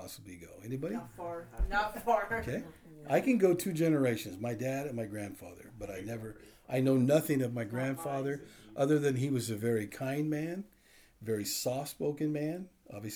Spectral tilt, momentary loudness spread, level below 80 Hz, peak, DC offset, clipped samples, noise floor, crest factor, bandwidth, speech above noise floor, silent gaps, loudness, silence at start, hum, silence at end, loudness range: -6 dB/octave; 18 LU; -50 dBFS; -14 dBFS; under 0.1%; under 0.1%; -61 dBFS; 18 dB; over 20 kHz; 28 dB; none; -33 LUFS; 0 s; none; 0 s; 4 LU